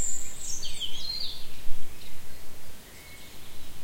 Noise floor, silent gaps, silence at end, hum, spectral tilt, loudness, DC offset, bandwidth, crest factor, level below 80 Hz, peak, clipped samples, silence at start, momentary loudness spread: -43 dBFS; none; 0 s; none; -1 dB/octave; -37 LUFS; under 0.1%; 16.5 kHz; 14 dB; -40 dBFS; -8 dBFS; under 0.1%; 0 s; 15 LU